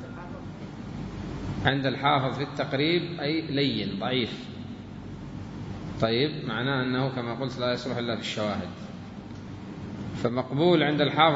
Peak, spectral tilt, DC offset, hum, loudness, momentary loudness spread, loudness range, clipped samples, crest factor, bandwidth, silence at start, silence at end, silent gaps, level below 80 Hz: -6 dBFS; -6.5 dB/octave; under 0.1%; none; -28 LUFS; 16 LU; 4 LU; under 0.1%; 22 dB; 7.8 kHz; 0 s; 0 s; none; -52 dBFS